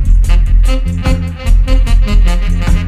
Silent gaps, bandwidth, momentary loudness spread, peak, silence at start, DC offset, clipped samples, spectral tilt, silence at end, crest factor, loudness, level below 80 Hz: none; 10 kHz; 3 LU; 0 dBFS; 0 s; under 0.1%; under 0.1%; -6.5 dB/octave; 0 s; 8 dB; -13 LUFS; -8 dBFS